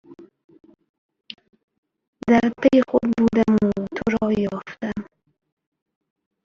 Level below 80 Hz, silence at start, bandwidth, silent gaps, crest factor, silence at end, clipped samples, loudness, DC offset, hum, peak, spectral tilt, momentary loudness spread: -52 dBFS; 0.1 s; 7.2 kHz; 0.44-0.49 s, 0.89-1.09 s, 1.63-1.68 s, 1.78-1.83 s, 2.08-2.13 s; 20 dB; 1.4 s; under 0.1%; -20 LUFS; under 0.1%; none; -4 dBFS; -7.5 dB/octave; 21 LU